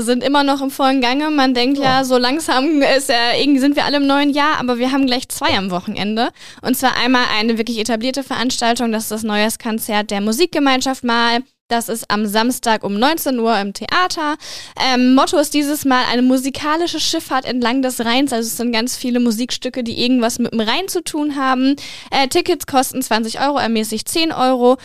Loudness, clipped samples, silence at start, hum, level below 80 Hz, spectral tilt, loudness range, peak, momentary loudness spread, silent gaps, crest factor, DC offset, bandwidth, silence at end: -16 LUFS; under 0.1%; 0 s; none; -48 dBFS; -3 dB/octave; 3 LU; -2 dBFS; 6 LU; 11.61-11.69 s; 14 dB; 2%; 15.5 kHz; 0 s